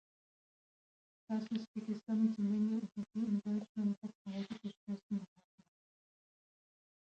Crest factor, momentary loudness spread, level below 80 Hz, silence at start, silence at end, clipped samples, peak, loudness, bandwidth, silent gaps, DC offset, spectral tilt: 18 dB; 10 LU; -84 dBFS; 1.3 s; 1.75 s; under 0.1%; -24 dBFS; -39 LUFS; 7.6 kHz; 1.68-1.74 s, 3.69-3.75 s, 3.97-4.01 s, 4.15-4.25 s, 4.77-4.87 s, 5.03-5.10 s; under 0.1%; -8 dB/octave